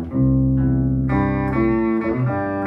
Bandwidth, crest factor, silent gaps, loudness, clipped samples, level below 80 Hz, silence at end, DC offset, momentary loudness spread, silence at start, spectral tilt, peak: 4.1 kHz; 10 dB; none; -19 LUFS; under 0.1%; -30 dBFS; 0 s; under 0.1%; 3 LU; 0 s; -11.5 dB/octave; -8 dBFS